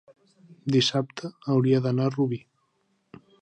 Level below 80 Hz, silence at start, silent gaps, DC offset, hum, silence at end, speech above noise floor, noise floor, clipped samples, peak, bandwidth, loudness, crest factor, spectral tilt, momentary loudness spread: -68 dBFS; 0.65 s; none; under 0.1%; none; 1.05 s; 47 dB; -71 dBFS; under 0.1%; -10 dBFS; 9.6 kHz; -25 LUFS; 16 dB; -6 dB/octave; 13 LU